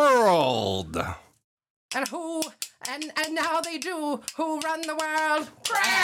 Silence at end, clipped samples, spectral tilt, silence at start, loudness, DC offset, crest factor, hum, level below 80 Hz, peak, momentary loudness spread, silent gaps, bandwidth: 0 s; under 0.1%; -3 dB/octave; 0 s; -27 LUFS; under 0.1%; 18 dB; none; -58 dBFS; -8 dBFS; 11 LU; 1.44-1.57 s, 1.70-1.89 s; 17 kHz